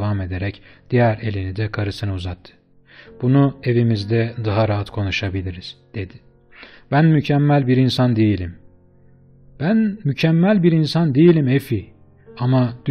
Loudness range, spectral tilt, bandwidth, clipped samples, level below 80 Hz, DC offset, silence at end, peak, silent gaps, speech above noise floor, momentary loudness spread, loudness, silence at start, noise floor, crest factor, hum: 4 LU; -8 dB/octave; 13 kHz; under 0.1%; -48 dBFS; under 0.1%; 0 s; -4 dBFS; none; 32 dB; 14 LU; -18 LUFS; 0 s; -50 dBFS; 16 dB; none